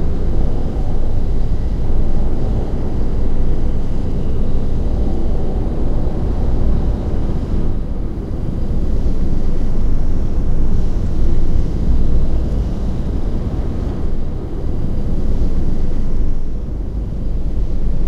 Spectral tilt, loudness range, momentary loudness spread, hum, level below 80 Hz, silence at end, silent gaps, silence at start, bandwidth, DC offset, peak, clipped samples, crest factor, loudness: -9 dB/octave; 2 LU; 4 LU; none; -16 dBFS; 0 s; none; 0 s; 3.1 kHz; under 0.1%; -2 dBFS; under 0.1%; 12 dB; -22 LUFS